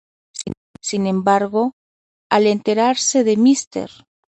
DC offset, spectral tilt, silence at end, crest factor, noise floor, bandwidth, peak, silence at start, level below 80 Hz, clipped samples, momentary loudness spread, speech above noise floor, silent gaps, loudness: under 0.1%; -4 dB/octave; 0.45 s; 18 dB; under -90 dBFS; 9 kHz; 0 dBFS; 0.35 s; -60 dBFS; under 0.1%; 15 LU; over 74 dB; 0.57-0.74 s, 1.73-2.30 s, 3.67-3.71 s; -17 LUFS